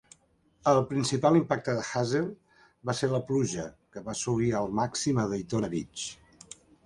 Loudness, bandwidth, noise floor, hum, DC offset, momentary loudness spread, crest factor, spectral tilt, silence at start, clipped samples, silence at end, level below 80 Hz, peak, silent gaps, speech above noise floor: -29 LUFS; 11.5 kHz; -66 dBFS; none; under 0.1%; 14 LU; 20 dB; -5.5 dB/octave; 0.65 s; under 0.1%; 0.7 s; -60 dBFS; -10 dBFS; none; 38 dB